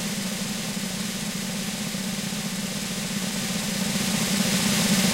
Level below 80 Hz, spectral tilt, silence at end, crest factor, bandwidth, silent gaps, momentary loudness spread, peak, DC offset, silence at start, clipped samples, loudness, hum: -52 dBFS; -3 dB/octave; 0 s; 18 dB; 16 kHz; none; 7 LU; -8 dBFS; 0.2%; 0 s; under 0.1%; -26 LUFS; none